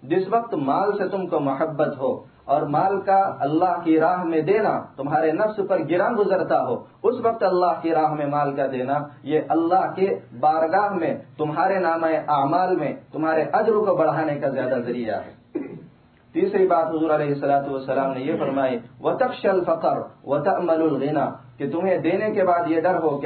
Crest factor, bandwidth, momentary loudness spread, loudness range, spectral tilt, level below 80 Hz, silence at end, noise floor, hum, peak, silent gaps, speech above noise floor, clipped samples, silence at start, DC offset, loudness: 14 dB; 4.5 kHz; 7 LU; 2 LU; -11 dB/octave; -66 dBFS; 0 s; -52 dBFS; none; -8 dBFS; none; 30 dB; under 0.1%; 0 s; under 0.1%; -22 LUFS